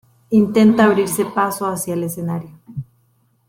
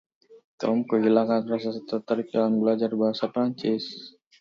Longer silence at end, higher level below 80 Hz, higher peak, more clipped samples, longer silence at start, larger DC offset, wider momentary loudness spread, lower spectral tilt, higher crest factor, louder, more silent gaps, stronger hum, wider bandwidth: first, 0.65 s vs 0.3 s; first, -56 dBFS vs -74 dBFS; first, -2 dBFS vs -8 dBFS; neither; about the same, 0.3 s vs 0.3 s; neither; first, 21 LU vs 9 LU; second, -6 dB/octave vs -7.5 dB/octave; about the same, 16 dB vs 18 dB; first, -17 LUFS vs -25 LUFS; second, none vs 0.44-0.58 s; neither; first, 16.5 kHz vs 7 kHz